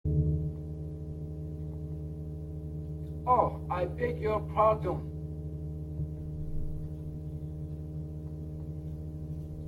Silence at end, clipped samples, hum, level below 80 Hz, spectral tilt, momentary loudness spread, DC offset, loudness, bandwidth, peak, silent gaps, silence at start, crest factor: 0 s; under 0.1%; none; -44 dBFS; -10 dB/octave; 13 LU; under 0.1%; -34 LUFS; 4.6 kHz; -12 dBFS; none; 0.05 s; 22 dB